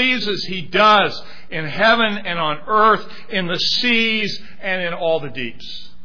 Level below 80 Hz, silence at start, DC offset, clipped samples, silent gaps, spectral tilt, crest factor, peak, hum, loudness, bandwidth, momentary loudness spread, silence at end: -52 dBFS; 0 s; 4%; under 0.1%; none; -4.5 dB/octave; 16 dB; -2 dBFS; none; -17 LUFS; 5.4 kHz; 14 LU; 0.15 s